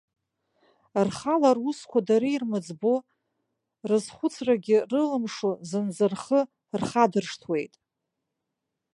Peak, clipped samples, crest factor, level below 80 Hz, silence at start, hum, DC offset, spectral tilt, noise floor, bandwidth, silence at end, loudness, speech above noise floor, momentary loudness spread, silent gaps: -6 dBFS; under 0.1%; 20 dB; -70 dBFS; 0.95 s; none; under 0.1%; -6 dB/octave; -83 dBFS; 11.5 kHz; 1.3 s; -26 LUFS; 58 dB; 8 LU; none